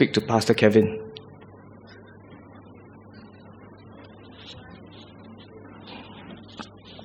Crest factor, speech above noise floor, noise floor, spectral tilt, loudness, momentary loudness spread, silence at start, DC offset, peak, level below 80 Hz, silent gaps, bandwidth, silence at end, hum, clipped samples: 26 dB; 27 dB; -47 dBFS; -6 dB/octave; -21 LUFS; 27 LU; 0 s; under 0.1%; -2 dBFS; -62 dBFS; none; 15.5 kHz; 0.05 s; none; under 0.1%